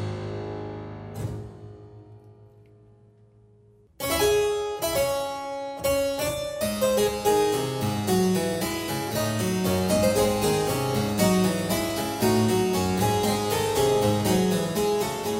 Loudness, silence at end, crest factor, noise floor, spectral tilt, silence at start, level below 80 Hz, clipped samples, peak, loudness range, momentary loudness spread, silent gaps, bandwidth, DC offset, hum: -25 LUFS; 0 s; 16 dB; -56 dBFS; -5 dB/octave; 0 s; -48 dBFS; under 0.1%; -10 dBFS; 11 LU; 12 LU; none; 16.5 kHz; under 0.1%; none